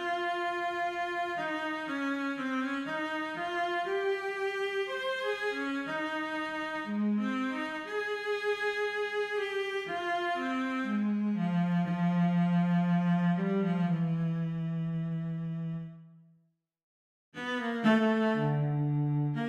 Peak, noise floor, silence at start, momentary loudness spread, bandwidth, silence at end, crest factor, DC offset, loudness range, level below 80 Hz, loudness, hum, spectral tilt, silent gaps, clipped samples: -14 dBFS; -71 dBFS; 0 s; 7 LU; 9.6 kHz; 0 s; 18 dB; under 0.1%; 4 LU; -72 dBFS; -31 LUFS; none; -7.5 dB/octave; 16.83-17.32 s; under 0.1%